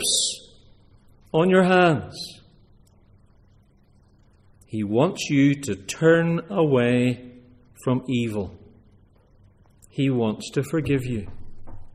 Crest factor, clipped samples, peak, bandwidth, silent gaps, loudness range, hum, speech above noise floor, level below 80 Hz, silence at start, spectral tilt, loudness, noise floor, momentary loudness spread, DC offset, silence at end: 18 dB; under 0.1%; -6 dBFS; 14 kHz; none; 7 LU; none; 35 dB; -50 dBFS; 0 s; -5 dB/octave; -22 LUFS; -57 dBFS; 16 LU; under 0.1%; 0.05 s